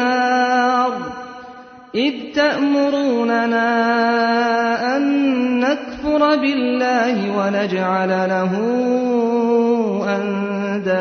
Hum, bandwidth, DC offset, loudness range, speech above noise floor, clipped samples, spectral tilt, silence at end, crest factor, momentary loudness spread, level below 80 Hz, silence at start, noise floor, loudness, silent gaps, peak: none; 6.6 kHz; under 0.1%; 2 LU; 22 dB; under 0.1%; -6 dB/octave; 0 s; 14 dB; 6 LU; -54 dBFS; 0 s; -39 dBFS; -18 LUFS; none; -4 dBFS